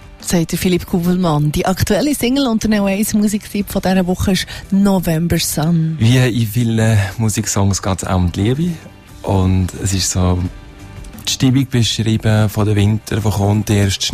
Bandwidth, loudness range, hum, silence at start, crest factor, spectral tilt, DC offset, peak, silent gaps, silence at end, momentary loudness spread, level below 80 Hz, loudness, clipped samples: 15.5 kHz; 2 LU; none; 0 s; 14 dB; -5.5 dB/octave; under 0.1%; -2 dBFS; none; 0 s; 5 LU; -34 dBFS; -16 LUFS; under 0.1%